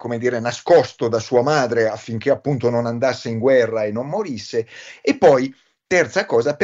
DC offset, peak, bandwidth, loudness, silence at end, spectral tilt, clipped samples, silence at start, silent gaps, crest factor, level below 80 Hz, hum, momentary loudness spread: under 0.1%; -2 dBFS; 7.8 kHz; -19 LUFS; 0 s; -5.5 dB/octave; under 0.1%; 0 s; none; 16 dB; -60 dBFS; none; 10 LU